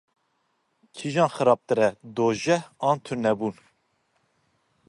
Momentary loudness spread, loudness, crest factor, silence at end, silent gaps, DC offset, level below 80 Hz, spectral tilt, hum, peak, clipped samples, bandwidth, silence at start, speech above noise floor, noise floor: 8 LU; -24 LUFS; 20 dB; 1.35 s; none; under 0.1%; -68 dBFS; -5.5 dB/octave; none; -6 dBFS; under 0.1%; 11.5 kHz; 0.95 s; 48 dB; -72 dBFS